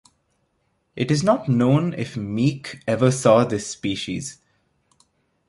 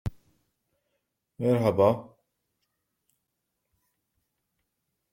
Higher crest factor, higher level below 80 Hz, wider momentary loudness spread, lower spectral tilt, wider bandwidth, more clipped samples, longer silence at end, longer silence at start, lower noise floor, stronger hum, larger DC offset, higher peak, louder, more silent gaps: about the same, 20 dB vs 24 dB; about the same, -56 dBFS vs -56 dBFS; about the same, 13 LU vs 12 LU; second, -6 dB/octave vs -8.5 dB/octave; second, 11.5 kHz vs 16.5 kHz; neither; second, 1.15 s vs 3.1 s; first, 0.95 s vs 0.05 s; second, -69 dBFS vs -81 dBFS; neither; neither; first, -2 dBFS vs -8 dBFS; first, -21 LUFS vs -25 LUFS; neither